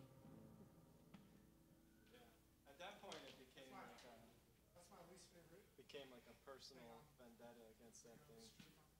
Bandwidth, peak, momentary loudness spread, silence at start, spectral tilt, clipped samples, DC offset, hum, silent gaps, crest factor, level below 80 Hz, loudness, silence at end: 16 kHz; -38 dBFS; 9 LU; 0 s; -3.5 dB/octave; under 0.1%; under 0.1%; none; none; 28 dB; -82 dBFS; -63 LUFS; 0 s